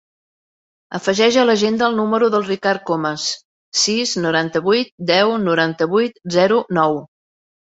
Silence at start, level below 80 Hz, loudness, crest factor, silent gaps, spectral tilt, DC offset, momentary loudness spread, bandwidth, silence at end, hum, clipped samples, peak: 0.9 s; -62 dBFS; -17 LUFS; 16 dB; 3.45-3.72 s, 4.91-4.98 s; -4 dB/octave; under 0.1%; 7 LU; 8.2 kHz; 0.7 s; none; under 0.1%; -2 dBFS